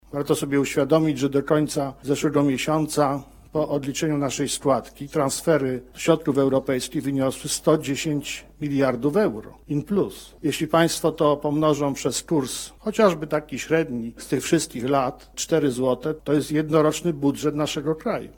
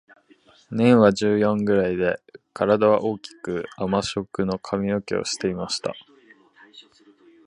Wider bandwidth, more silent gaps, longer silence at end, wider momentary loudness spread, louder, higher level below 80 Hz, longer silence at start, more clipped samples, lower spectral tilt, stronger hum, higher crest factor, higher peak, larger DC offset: first, 17.5 kHz vs 11 kHz; neither; second, 0.05 s vs 0.65 s; second, 8 LU vs 14 LU; about the same, -23 LUFS vs -22 LUFS; about the same, -52 dBFS vs -56 dBFS; second, 0.1 s vs 0.7 s; neither; about the same, -5 dB/octave vs -5.5 dB/octave; neither; about the same, 20 dB vs 22 dB; about the same, -4 dBFS vs -2 dBFS; neither